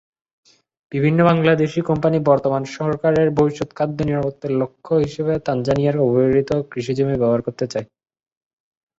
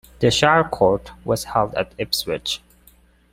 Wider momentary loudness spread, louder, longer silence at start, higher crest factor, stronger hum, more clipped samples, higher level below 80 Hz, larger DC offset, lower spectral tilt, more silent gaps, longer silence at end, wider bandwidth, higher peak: about the same, 8 LU vs 10 LU; about the same, -19 LUFS vs -20 LUFS; first, 0.9 s vs 0.2 s; about the same, 18 dB vs 20 dB; neither; neither; about the same, -50 dBFS vs -46 dBFS; neither; first, -8 dB/octave vs -4 dB/octave; neither; first, 1.15 s vs 0.75 s; second, 7.8 kHz vs 16.5 kHz; about the same, -2 dBFS vs -2 dBFS